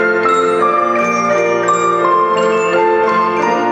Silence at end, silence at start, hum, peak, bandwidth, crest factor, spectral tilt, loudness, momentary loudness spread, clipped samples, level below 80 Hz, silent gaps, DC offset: 0 s; 0 s; none; 0 dBFS; 9.2 kHz; 12 dB; -4.5 dB/octave; -13 LUFS; 1 LU; under 0.1%; -60 dBFS; none; under 0.1%